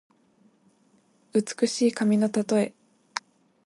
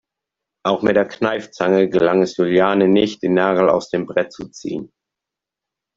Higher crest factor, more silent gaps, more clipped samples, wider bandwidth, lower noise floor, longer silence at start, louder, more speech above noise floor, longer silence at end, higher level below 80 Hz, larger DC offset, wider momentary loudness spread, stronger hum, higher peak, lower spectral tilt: about the same, 18 dB vs 16 dB; neither; neither; first, 11.5 kHz vs 7.6 kHz; second, -64 dBFS vs -85 dBFS; first, 1.35 s vs 0.65 s; second, -26 LUFS vs -17 LUFS; second, 40 dB vs 68 dB; second, 0.45 s vs 1.1 s; second, -74 dBFS vs -56 dBFS; neither; about the same, 13 LU vs 13 LU; neither; second, -8 dBFS vs -2 dBFS; second, -5 dB/octave vs -6.5 dB/octave